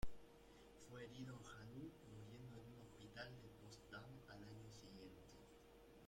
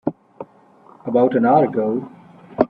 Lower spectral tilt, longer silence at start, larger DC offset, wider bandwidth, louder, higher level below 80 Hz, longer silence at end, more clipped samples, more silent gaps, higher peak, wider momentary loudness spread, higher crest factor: second, -5.5 dB/octave vs -10.5 dB/octave; about the same, 0 s vs 0.05 s; neither; first, 16.5 kHz vs 5 kHz; second, -60 LUFS vs -18 LUFS; second, -66 dBFS vs -60 dBFS; about the same, 0 s vs 0.05 s; neither; neither; second, -32 dBFS vs 0 dBFS; second, 10 LU vs 24 LU; about the same, 22 dB vs 20 dB